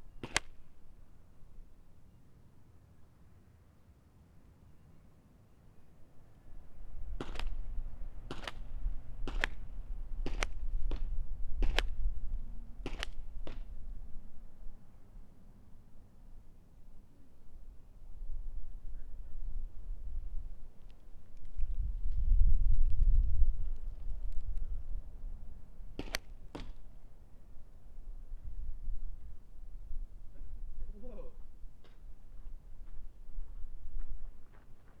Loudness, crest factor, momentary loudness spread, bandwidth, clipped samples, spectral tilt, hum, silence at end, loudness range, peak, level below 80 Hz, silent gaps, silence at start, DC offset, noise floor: -42 LUFS; 26 dB; 26 LU; 9.6 kHz; under 0.1%; -4 dB/octave; none; 0 s; 26 LU; -6 dBFS; -38 dBFS; none; 0 s; under 0.1%; -61 dBFS